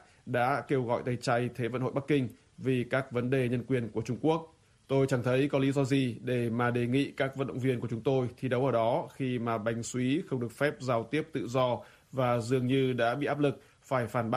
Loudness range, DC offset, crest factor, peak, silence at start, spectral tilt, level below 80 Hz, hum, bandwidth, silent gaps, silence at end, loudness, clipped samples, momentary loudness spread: 2 LU; under 0.1%; 16 dB; -14 dBFS; 0.25 s; -6.5 dB/octave; -64 dBFS; none; 13 kHz; none; 0 s; -31 LUFS; under 0.1%; 5 LU